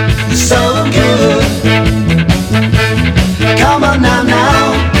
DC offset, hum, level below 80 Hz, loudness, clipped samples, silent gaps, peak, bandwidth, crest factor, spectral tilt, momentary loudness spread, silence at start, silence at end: under 0.1%; none; -20 dBFS; -10 LUFS; 0.3%; none; 0 dBFS; 19.5 kHz; 10 dB; -5 dB/octave; 2 LU; 0 s; 0 s